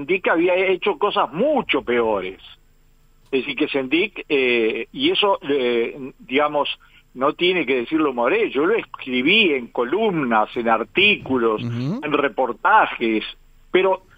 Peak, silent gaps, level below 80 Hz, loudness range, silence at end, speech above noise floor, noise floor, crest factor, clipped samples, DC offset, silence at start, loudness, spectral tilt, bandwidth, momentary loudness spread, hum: -2 dBFS; none; -54 dBFS; 4 LU; 0.2 s; 34 dB; -54 dBFS; 18 dB; under 0.1%; under 0.1%; 0 s; -19 LUFS; -7 dB/octave; 7.8 kHz; 8 LU; none